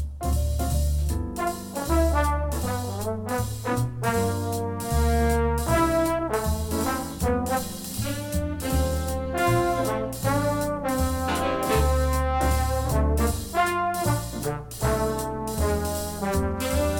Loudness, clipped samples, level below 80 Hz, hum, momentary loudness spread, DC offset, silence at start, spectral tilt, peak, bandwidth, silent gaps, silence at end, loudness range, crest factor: -26 LUFS; under 0.1%; -30 dBFS; none; 6 LU; under 0.1%; 0 s; -5.5 dB/octave; -8 dBFS; 19 kHz; none; 0 s; 2 LU; 16 dB